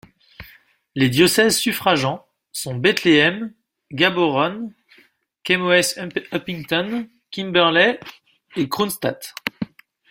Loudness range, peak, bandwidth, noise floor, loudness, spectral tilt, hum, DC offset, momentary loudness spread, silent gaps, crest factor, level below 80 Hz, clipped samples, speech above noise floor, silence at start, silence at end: 3 LU; -2 dBFS; 16.5 kHz; -57 dBFS; -19 LUFS; -4 dB/octave; none; under 0.1%; 18 LU; none; 20 dB; -58 dBFS; under 0.1%; 38 dB; 0.4 s; 0.45 s